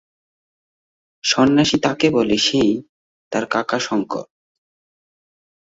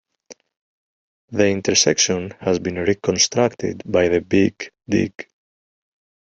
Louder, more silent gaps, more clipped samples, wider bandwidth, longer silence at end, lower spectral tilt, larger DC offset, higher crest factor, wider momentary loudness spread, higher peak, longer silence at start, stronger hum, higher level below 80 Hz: about the same, -18 LUFS vs -19 LUFS; second, 2.89-3.31 s vs 0.57-1.28 s; neither; about the same, 8 kHz vs 8.2 kHz; first, 1.45 s vs 1 s; about the same, -4 dB/octave vs -3.5 dB/octave; neither; about the same, 20 dB vs 20 dB; about the same, 11 LU vs 11 LU; about the same, -2 dBFS vs -2 dBFS; first, 1.25 s vs 0.3 s; neither; about the same, -54 dBFS vs -56 dBFS